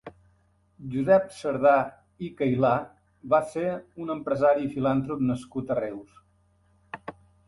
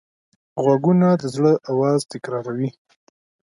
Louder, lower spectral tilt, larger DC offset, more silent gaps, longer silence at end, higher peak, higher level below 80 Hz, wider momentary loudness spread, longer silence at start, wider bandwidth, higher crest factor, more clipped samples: second, -26 LUFS vs -20 LUFS; about the same, -8 dB/octave vs -7.5 dB/octave; neither; neither; second, 0.35 s vs 0.8 s; second, -8 dBFS vs -4 dBFS; first, -60 dBFS vs -66 dBFS; first, 19 LU vs 12 LU; second, 0.05 s vs 0.55 s; about the same, 11.5 kHz vs 11.5 kHz; about the same, 18 dB vs 16 dB; neither